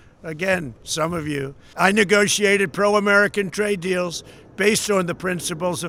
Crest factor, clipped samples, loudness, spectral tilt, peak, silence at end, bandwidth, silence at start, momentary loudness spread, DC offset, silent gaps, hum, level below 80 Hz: 20 dB; under 0.1%; -20 LUFS; -3.5 dB/octave; 0 dBFS; 0 s; 16.5 kHz; 0.25 s; 11 LU; under 0.1%; none; none; -54 dBFS